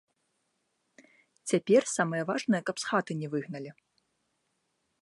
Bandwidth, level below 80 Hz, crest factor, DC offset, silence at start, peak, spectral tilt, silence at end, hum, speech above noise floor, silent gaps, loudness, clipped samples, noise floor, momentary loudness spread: 11.5 kHz; -82 dBFS; 20 dB; under 0.1%; 1.45 s; -12 dBFS; -5 dB/octave; 1.3 s; none; 49 dB; none; -29 LUFS; under 0.1%; -78 dBFS; 17 LU